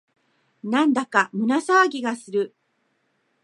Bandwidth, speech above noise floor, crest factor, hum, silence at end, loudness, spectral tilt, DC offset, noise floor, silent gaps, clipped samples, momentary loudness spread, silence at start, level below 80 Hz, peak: 11.5 kHz; 49 dB; 20 dB; none; 0.95 s; -22 LUFS; -4.5 dB/octave; under 0.1%; -70 dBFS; none; under 0.1%; 10 LU; 0.65 s; -78 dBFS; -2 dBFS